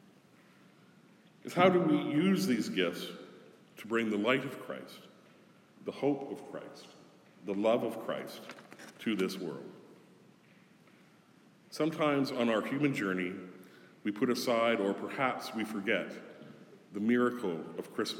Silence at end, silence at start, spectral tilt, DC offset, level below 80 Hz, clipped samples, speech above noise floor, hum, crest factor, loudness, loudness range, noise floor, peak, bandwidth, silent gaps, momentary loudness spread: 0 s; 1.45 s; -5.5 dB/octave; under 0.1%; -88 dBFS; under 0.1%; 30 dB; none; 22 dB; -32 LUFS; 8 LU; -62 dBFS; -12 dBFS; 17 kHz; none; 21 LU